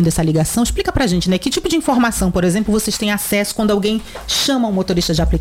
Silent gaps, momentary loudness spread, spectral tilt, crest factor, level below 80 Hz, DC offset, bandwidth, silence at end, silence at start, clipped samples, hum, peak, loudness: none; 3 LU; -4.5 dB/octave; 10 dB; -28 dBFS; under 0.1%; 16.5 kHz; 0 s; 0 s; under 0.1%; none; -6 dBFS; -16 LUFS